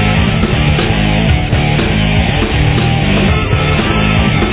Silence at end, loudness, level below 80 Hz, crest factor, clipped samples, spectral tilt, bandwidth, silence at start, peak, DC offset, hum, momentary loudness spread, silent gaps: 0 s; -12 LUFS; -18 dBFS; 10 dB; under 0.1%; -10.5 dB/octave; 4 kHz; 0 s; 0 dBFS; under 0.1%; none; 1 LU; none